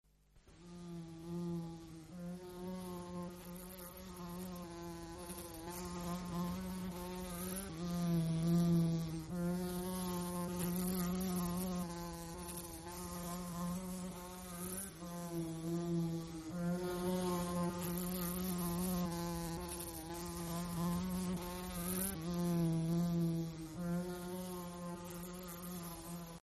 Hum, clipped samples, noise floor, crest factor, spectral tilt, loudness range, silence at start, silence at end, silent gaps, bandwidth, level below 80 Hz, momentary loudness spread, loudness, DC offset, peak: none; under 0.1%; -66 dBFS; 16 dB; -6 dB/octave; 10 LU; 0.35 s; 0.05 s; none; 13.5 kHz; -58 dBFS; 12 LU; -41 LUFS; under 0.1%; -24 dBFS